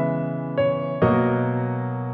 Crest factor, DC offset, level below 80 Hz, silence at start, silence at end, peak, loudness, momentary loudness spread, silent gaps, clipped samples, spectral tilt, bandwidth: 16 dB; under 0.1%; -52 dBFS; 0 s; 0 s; -8 dBFS; -23 LUFS; 7 LU; none; under 0.1%; -11.5 dB/octave; 4.4 kHz